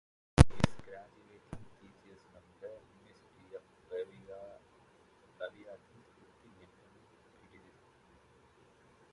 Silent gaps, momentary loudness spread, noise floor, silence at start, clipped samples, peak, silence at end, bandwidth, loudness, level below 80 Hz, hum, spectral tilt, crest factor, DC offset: none; 28 LU; -65 dBFS; 0.4 s; under 0.1%; -2 dBFS; 3.35 s; 11 kHz; -33 LUFS; -44 dBFS; none; -6.5 dB/octave; 36 dB; under 0.1%